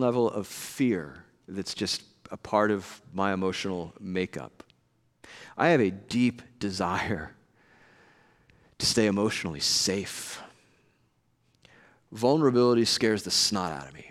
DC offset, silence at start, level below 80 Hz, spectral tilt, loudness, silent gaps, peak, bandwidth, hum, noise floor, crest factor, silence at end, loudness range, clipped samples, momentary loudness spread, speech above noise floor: under 0.1%; 0 s; -62 dBFS; -4 dB/octave; -27 LUFS; none; -8 dBFS; 16 kHz; none; -69 dBFS; 20 dB; 0 s; 4 LU; under 0.1%; 17 LU; 42 dB